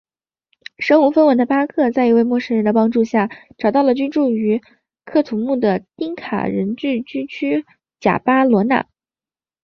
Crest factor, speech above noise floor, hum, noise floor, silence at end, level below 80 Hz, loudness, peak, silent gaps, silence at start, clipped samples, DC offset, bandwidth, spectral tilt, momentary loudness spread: 16 dB; over 74 dB; none; under -90 dBFS; 0.8 s; -58 dBFS; -17 LUFS; -2 dBFS; none; 0.8 s; under 0.1%; under 0.1%; 6.6 kHz; -7.5 dB/octave; 9 LU